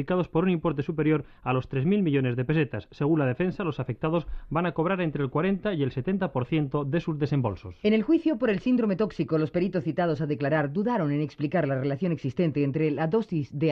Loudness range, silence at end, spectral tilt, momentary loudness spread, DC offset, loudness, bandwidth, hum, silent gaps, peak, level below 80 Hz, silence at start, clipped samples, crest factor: 2 LU; 0 s; -9.5 dB/octave; 4 LU; under 0.1%; -27 LUFS; 6.4 kHz; none; none; -12 dBFS; -50 dBFS; 0 s; under 0.1%; 14 dB